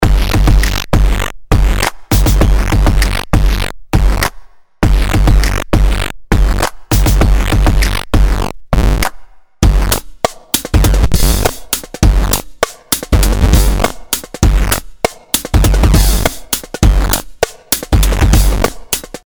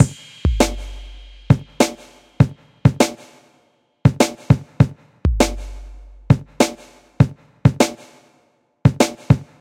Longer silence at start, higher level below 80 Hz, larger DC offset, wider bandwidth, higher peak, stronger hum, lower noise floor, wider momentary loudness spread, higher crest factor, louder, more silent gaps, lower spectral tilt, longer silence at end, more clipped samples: about the same, 0 s vs 0 s; first, -12 dBFS vs -32 dBFS; neither; first, over 20 kHz vs 16.5 kHz; about the same, 0 dBFS vs 0 dBFS; neither; second, -32 dBFS vs -60 dBFS; about the same, 8 LU vs 7 LU; second, 10 dB vs 18 dB; first, -14 LUFS vs -19 LUFS; neither; second, -4.5 dB/octave vs -6 dB/octave; about the same, 0.1 s vs 0.2 s; neither